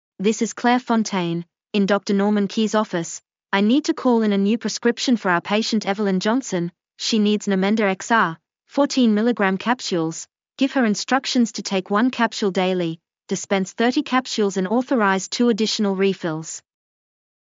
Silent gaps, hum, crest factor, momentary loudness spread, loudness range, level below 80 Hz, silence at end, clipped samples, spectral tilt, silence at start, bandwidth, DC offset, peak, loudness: none; none; 16 dB; 9 LU; 1 LU; -78 dBFS; 0.85 s; under 0.1%; -4.5 dB/octave; 0.2 s; 7.6 kHz; under 0.1%; -4 dBFS; -21 LUFS